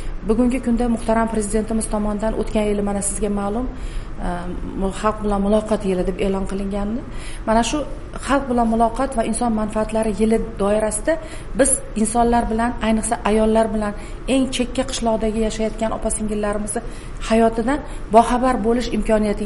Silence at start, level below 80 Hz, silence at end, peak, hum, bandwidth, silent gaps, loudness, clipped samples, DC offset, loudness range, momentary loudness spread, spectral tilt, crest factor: 0 s; -30 dBFS; 0 s; 0 dBFS; none; 11.5 kHz; none; -20 LUFS; under 0.1%; 0.7%; 3 LU; 10 LU; -5 dB/octave; 20 dB